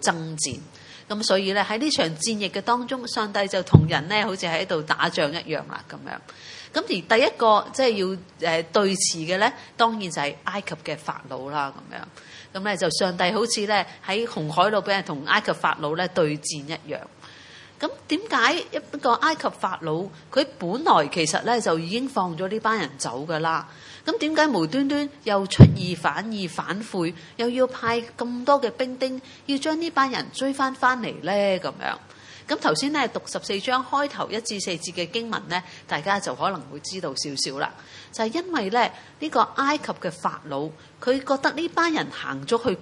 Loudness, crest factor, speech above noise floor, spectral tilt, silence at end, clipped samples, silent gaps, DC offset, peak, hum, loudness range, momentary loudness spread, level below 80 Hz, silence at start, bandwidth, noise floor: -24 LUFS; 24 dB; 22 dB; -4.5 dB/octave; 0 s; under 0.1%; none; under 0.1%; 0 dBFS; none; 5 LU; 11 LU; -54 dBFS; 0 s; 11.5 kHz; -46 dBFS